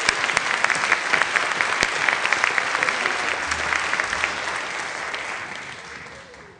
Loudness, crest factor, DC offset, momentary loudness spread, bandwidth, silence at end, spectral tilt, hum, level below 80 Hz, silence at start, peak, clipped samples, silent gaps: -21 LUFS; 24 dB; under 0.1%; 14 LU; 10 kHz; 0.05 s; -1 dB/octave; none; -54 dBFS; 0 s; 0 dBFS; under 0.1%; none